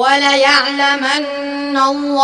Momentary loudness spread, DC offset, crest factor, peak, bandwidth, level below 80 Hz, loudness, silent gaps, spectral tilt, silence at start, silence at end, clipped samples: 9 LU; under 0.1%; 14 dB; 0 dBFS; 10.5 kHz; -56 dBFS; -13 LUFS; none; -1 dB/octave; 0 s; 0 s; under 0.1%